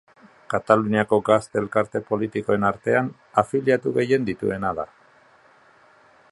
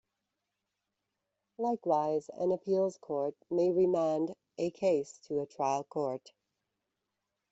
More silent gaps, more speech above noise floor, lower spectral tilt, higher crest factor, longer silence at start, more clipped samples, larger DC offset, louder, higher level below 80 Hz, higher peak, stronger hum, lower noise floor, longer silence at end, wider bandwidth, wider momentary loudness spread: neither; second, 33 dB vs 55 dB; about the same, -7 dB/octave vs -7 dB/octave; about the same, 22 dB vs 18 dB; second, 0.5 s vs 1.6 s; neither; neither; first, -22 LUFS vs -33 LUFS; first, -56 dBFS vs -78 dBFS; first, -2 dBFS vs -16 dBFS; neither; second, -55 dBFS vs -86 dBFS; about the same, 1.45 s vs 1.35 s; first, 11.5 kHz vs 8 kHz; about the same, 8 LU vs 9 LU